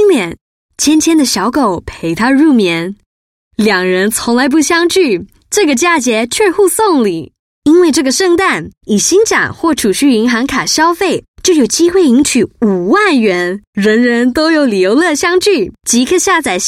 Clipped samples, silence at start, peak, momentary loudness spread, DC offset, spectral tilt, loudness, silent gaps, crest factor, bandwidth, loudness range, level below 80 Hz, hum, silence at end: under 0.1%; 0 s; 0 dBFS; 7 LU; under 0.1%; -3.5 dB/octave; -11 LUFS; 0.41-0.69 s, 3.06-3.51 s, 7.39-7.62 s, 8.77-8.81 s, 11.28-11.34 s, 13.67-13.73 s; 10 dB; 16.5 kHz; 2 LU; -44 dBFS; none; 0 s